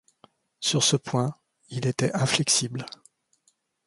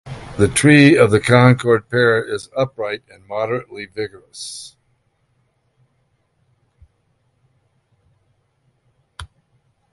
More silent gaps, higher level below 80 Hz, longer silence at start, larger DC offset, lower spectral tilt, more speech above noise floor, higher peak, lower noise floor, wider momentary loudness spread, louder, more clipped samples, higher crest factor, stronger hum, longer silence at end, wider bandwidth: neither; second, -64 dBFS vs -48 dBFS; first, 0.6 s vs 0.05 s; neither; second, -3.5 dB/octave vs -5.5 dB/octave; second, 44 dB vs 49 dB; second, -6 dBFS vs 0 dBFS; first, -69 dBFS vs -65 dBFS; second, 14 LU vs 22 LU; second, -24 LUFS vs -15 LUFS; neither; about the same, 22 dB vs 20 dB; neither; first, 1 s vs 0.65 s; about the same, 11.5 kHz vs 11.5 kHz